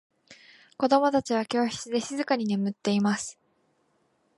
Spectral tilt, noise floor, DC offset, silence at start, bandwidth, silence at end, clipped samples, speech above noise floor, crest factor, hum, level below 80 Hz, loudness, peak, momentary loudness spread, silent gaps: -5 dB/octave; -70 dBFS; under 0.1%; 0.3 s; 11.5 kHz; 1.05 s; under 0.1%; 44 dB; 20 dB; none; -70 dBFS; -26 LUFS; -8 dBFS; 7 LU; none